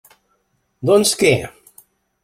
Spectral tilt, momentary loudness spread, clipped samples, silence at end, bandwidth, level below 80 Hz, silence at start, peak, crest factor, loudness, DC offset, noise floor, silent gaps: -4 dB/octave; 12 LU; under 0.1%; 0.75 s; 16 kHz; -54 dBFS; 0.8 s; -2 dBFS; 18 dB; -16 LUFS; under 0.1%; -66 dBFS; none